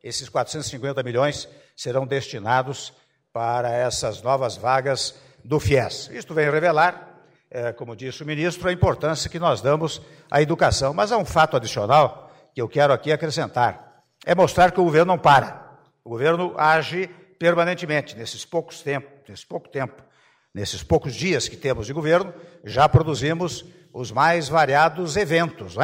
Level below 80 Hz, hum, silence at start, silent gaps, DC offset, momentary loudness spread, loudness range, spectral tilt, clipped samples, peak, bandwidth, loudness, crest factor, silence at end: -46 dBFS; none; 0.05 s; none; under 0.1%; 15 LU; 6 LU; -5 dB/octave; under 0.1%; -6 dBFS; 16 kHz; -21 LUFS; 16 dB; 0 s